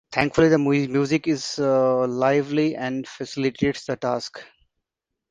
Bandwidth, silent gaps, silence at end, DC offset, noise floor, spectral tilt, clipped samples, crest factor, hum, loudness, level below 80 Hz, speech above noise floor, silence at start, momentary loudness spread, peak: 9.6 kHz; none; 0.85 s; under 0.1%; -83 dBFS; -6 dB/octave; under 0.1%; 20 dB; none; -22 LUFS; -54 dBFS; 62 dB; 0.1 s; 11 LU; -2 dBFS